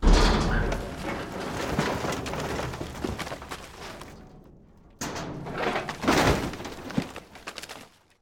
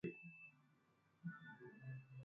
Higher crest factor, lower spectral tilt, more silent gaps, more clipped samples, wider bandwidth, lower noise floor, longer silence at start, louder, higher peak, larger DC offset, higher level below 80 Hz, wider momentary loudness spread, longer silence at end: about the same, 20 dB vs 20 dB; second, -5 dB/octave vs -7.5 dB/octave; neither; neither; first, 16.5 kHz vs 5.2 kHz; second, -53 dBFS vs -78 dBFS; about the same, 0 s vs 0.05 s; first, -29 LUFS vs -57 LUFS; first, -8 dBFS vs -36 dBFS; neither; first, -32 dBFS vs -88 dBFS; first, 18 LU vs 7 LU; first, 0.35 s vs 0 s